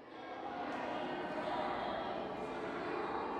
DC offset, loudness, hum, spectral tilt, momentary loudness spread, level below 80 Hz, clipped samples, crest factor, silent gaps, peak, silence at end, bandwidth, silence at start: under 0.1%; -41 LUFS; none; -5.5 dB/octave; 5 LU; -68 dBFS; under 0.1%; 14 dB; none; -28 dBFS; 0 s; 11.5 kHz; 0 s